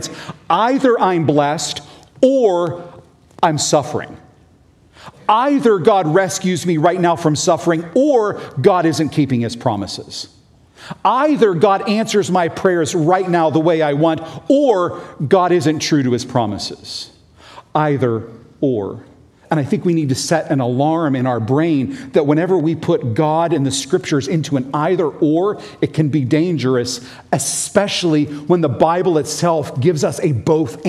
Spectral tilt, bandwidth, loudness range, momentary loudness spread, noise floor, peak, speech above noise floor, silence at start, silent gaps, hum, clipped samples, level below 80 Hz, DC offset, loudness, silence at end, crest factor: -5.5 dB/octave; 14 kHz; 3 LU; 10 LU; -50 dBFS; 0 dBFS; 34 dB; 0 s; none; none; under 0.1%; -56 dBFS; under 0.1%; -16 LUFS; 0 s; 16 dB